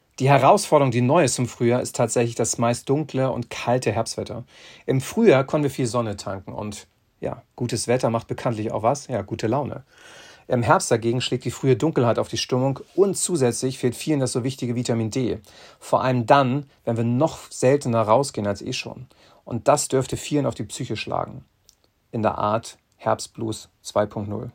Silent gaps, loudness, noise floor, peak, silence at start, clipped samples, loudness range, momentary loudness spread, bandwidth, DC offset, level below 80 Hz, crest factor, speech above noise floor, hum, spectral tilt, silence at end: none; -22 LUFS; -60 dBFS; -2 dBFS; 0.2 s; under 0.1%; 5 LU; 14 LU; 16.5 kHz; under 0.1%; -56 dBFS; 20 dB; 38 dB; none; -5.5 dB/octave; 0.05 s